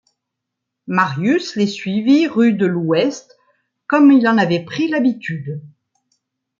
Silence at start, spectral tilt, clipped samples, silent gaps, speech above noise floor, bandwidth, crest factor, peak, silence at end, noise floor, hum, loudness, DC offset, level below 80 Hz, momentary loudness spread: 0.9 s; -6.5 dB/octave; under 0.1%; none; 64 dB; 7.4 kHz; 16 dB; -2 dBFS; 0.9 s; -79 dBFS; none; -16 LUFS; under 0.1%; -66 dBFS; 14 LU